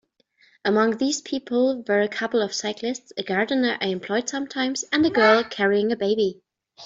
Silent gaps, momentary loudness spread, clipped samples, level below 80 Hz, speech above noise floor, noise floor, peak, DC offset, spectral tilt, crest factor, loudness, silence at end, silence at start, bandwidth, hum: none; 10 LU; under 0.1%; -68 dBFS; 39 dB; -61 dBFS; -4 dBFS; under 0.1%; -3.5 dB/octave; 20 dB; -23 LUFS; 0 s; 0.65 s; 7.8 kHz; none